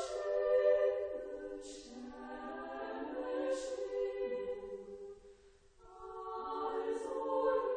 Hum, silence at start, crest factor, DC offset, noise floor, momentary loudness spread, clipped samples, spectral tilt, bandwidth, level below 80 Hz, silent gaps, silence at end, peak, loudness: none; 0 s; 18 dB; under 0.1%; -63 dBFS; 18 LU; under 0.1%; -4 dB/octave; 9.8 kHz; -66 dBFS; none; 0 s; -20 dBFS; -38 LUFS